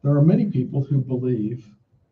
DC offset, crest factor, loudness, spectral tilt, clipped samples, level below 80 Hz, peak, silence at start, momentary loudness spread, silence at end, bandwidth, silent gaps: under 0.1%; 16 dB; -22 LUFS; -12 dB/octave; under 0.1%; -58 dBFS; -6 dBFS; 0.05 s; 11 LU; 0.5 s; 4.3 kHz; none